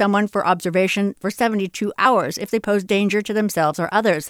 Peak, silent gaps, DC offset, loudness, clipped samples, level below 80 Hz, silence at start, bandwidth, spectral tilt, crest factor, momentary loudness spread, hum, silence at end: -4 dBFS; none; under 0.1%; -20 LUFS; under 0.1%; -60 dBFS; 0 s; 17 kHz; -5 dB/octave; 16 dB; 6 LU; none; 0 s